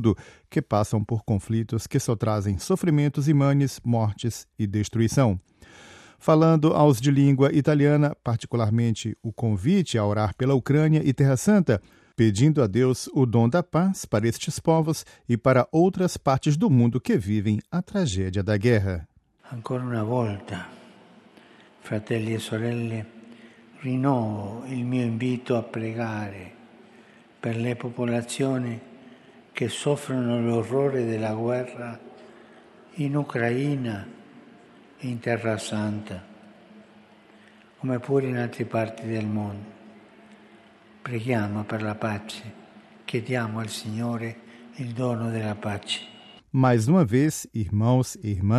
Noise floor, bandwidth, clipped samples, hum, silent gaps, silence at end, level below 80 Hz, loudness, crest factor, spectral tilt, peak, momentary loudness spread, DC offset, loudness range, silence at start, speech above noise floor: -53 dBFS; 13.5 kHz; under 0.1%; none; none; 0 s; -58 dBFS; -24 LUFS; 18 dB; -7 dB/octave; -6 dBFS; 14 LU; under 0.1%; 10 LU; 0 s; 29 dB